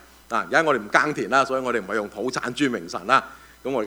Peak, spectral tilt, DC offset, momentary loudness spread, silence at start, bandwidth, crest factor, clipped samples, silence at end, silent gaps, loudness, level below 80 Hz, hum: 0 dBFS; -4 dB/octave; under 0.1%; 8 LU; 0.3 s; over 20 kHz; 22 dB; under 0.1%; 0 s; none; -23 LUFS; -58 dBFS; none